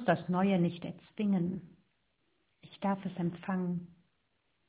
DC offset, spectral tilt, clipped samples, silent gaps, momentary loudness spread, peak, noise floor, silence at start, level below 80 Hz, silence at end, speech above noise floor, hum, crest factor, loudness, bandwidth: under 0.1%; -7 dB/octave; under 0.1%; none; 12 LU; -14 dBFS; -78 dBFS; 0 s; -70 dBFS; 0.85 s; 46 dB; none; 20 dB; -34 LUFS; 4 kHz